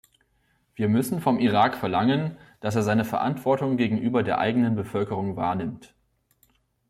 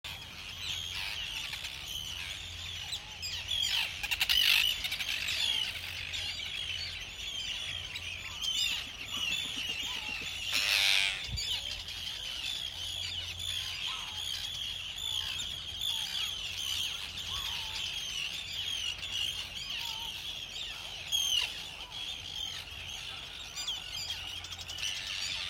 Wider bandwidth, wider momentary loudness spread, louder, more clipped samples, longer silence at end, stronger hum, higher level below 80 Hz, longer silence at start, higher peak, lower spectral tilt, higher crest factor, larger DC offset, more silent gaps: about the same, 15 kHz vs 16 kHz; second, 7 LU vs 10 LU; first, -25 LUFS vs -33 LUFS; neither; first, 1.05 s vs 0 s; neither; second, -62 dBFS vs -56 dBFS; first, 0.8 s vs 0.05 s; about the same, -8 dBFS vs -10 dBFS; first, -6.5 dB/octave vs 0 dB/octave; second, 18 dB vs 26 dB; neither; neither